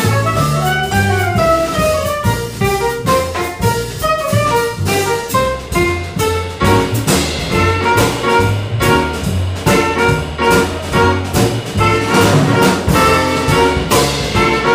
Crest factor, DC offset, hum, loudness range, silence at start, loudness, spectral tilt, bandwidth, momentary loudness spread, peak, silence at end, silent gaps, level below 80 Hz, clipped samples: 12 dB; under 0.1%; none; 3 LU; 0 s; -14 LUFS; -5 dB/octave; 16 kHz; 5 LU; -2 dBFS; 0 s; none; -30 dBFS; under 0.1%